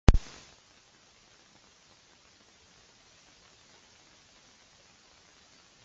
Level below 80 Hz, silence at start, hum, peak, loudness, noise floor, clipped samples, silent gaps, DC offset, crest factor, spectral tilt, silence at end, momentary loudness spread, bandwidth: -36 dBFS; 0.1 s; none; 0 dBFS; -32 LUFS; -61 dBFS; under 0.1%; none; under 0.1%; 34 dB; -6.5 dB/octave; 5.65 s; 7 LU; 7.8 kHz